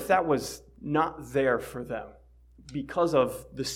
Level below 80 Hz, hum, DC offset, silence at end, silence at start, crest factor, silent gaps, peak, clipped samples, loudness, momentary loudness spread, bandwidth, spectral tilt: -54 dBFS; none; under 0.1%; 0 s; 0 s; 18 dB; none; -10 dBFS; under 0.1%; -28 LUFS; 14 LU; 16.5 kHz; -5 dB/octave